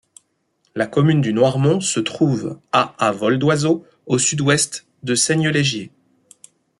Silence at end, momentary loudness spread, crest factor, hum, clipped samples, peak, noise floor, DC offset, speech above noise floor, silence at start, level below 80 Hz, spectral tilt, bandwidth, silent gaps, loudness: 0.9 s; 8 LU; 18 dB; none; under 0.1%; -2 dBFS; -67 dBFS; under 0.1%; 49 dB; 0.75 s; -58 dBFS; -4.5 dB/octave; 12 kHz; none; -18 LUFS